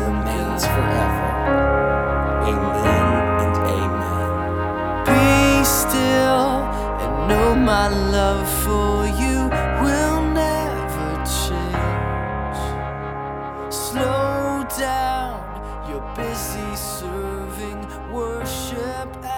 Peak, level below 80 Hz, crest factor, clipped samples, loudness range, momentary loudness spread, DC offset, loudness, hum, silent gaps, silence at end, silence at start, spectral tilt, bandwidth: -4 dBFS; -28 dBFS; 16 dB; under 0.1%; 8 LU; 12 LU; under 0.1%; -20 LUFS; none; none; 0 s; 0 s; -5 dB/octave; 19.5 kHz